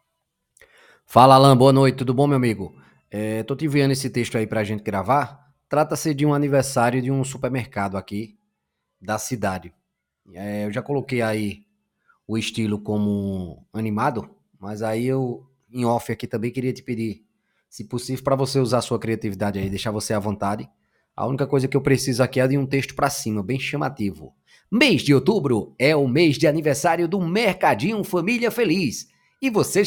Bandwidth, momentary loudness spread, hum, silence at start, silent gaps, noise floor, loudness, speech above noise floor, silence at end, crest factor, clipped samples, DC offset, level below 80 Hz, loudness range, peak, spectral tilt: 19 kHz; 13 LU; none; 1.1 s; none; -77 dBFS; -21 LUFS; 57 dB; 0 s; 22 dB; under 0.1%; under 0.1%; -56 dBFS; 9 LU; 0 dBFS; -5.5 dB/octave